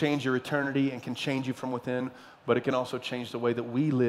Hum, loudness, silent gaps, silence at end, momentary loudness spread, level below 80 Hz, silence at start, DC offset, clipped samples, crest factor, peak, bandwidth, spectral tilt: none; -30 LUFS; none; 0 s; 7 LU; -74 dBFS; 0 s; under 0.1%; under 0.1%; 18 dB; -10 dBFS; 14 kHz; -6.5 dB/octave